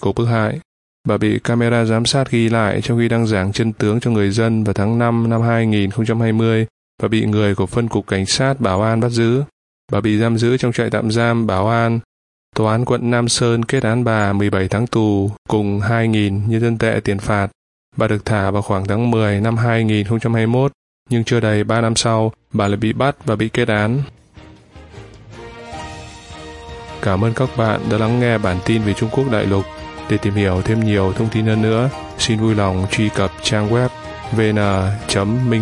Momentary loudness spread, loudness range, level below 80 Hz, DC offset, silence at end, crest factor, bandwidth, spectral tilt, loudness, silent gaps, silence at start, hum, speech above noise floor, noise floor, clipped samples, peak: 6 LU; 3 LU; -44 dBFS; under 0.1%; 0 s; 16 dB; 11 kHz; -6 dB/octave; -17 LUFS; 0.65-1.04 s, 6.70-6.98 s, 9.52-9.88 s, 12.05-12.52 s, 15.38-15.45 s, 17.55-17.92 s, 20.74-21.06 s; 0 s; none; 26 dB; -42 dBFS; under 0.1%; 0 dBFS